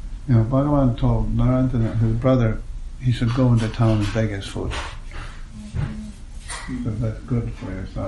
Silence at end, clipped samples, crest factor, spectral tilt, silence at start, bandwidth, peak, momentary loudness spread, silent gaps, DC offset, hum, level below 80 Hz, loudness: 0 s; under 0.1%; 16 dB; -7.5 dB/octave; 0 s; 11.5 kHz; -6 dBFS; 17 LU; none; under 0.1%; none; -30 dBFS; -22 LUFS